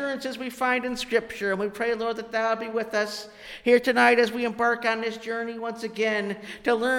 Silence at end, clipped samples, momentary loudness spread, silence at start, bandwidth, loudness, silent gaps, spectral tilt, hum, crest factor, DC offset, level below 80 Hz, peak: 0 s; under 0.1%; 12 LU; 0 s; 16.5 kHz; -25 LUFS; none; -4 dB/octave; none; 18 dB; under 0.1%; -62 dBFS; -8 dBFS